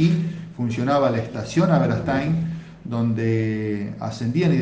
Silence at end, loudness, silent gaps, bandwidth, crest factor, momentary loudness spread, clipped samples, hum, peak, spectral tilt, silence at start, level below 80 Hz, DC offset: 0 s; -23 LUFS; none; 8 kHz; 16 dB; 10 LU; under 0.1%; none; -4 dBFS; -7.5 dB/octave; 0 s; -50 dBFS; under 0.1%